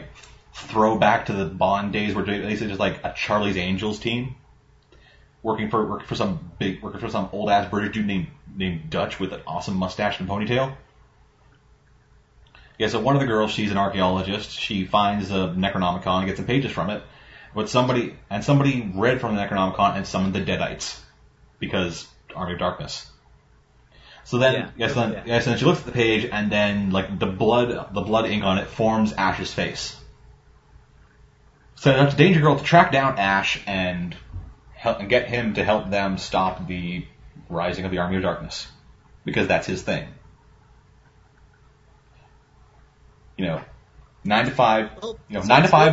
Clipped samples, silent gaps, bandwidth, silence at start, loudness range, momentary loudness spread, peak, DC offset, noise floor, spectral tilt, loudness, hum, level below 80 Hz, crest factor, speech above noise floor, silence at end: under 0.1%; none; 8 kHz; 0 s; 9 LU; 13 LU; 0 dBFS; under 0.1%; -56 dBFS; -6 dB/octave; -22 LUFS; none; -48 dBFS; 24 dB; 34 dB; 0 s